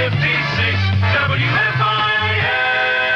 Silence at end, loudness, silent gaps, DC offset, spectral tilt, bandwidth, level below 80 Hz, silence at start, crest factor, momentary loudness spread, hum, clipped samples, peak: 0 s; -16 LUFS; none; under 0.1%; -6 dB/octave; 6.8 kHz; -44 dBFS; 0 s; 12 dB; 1 LU; none; under 0.1%; -6 dBFS